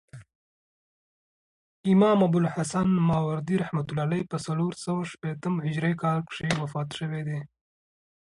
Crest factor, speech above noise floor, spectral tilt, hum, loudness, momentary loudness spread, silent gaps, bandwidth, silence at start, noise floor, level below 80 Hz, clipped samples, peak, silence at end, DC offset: 18 dB; over 64 dB; -7 dB/octave; none; -27 LUFS; 11 LU; 0.35-1.84 s; 11 kHz; 0.15 s; under -90 dBFS; -58 dBFS; under 0.1%; -8 dBFS; 0.8 s; under 0.1%